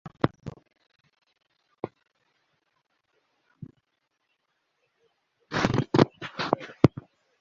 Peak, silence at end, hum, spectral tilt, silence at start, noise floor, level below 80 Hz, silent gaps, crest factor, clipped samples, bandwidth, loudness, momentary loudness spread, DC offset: -2 dBFS; 0.55 s; none; -6 dB/octave; 0.05 s; -78 dBFS; -54 dBFS; none; 30 dB; under 0.1%; 7.6 kHz; -26 LUFS; 25 LU; under 0.1%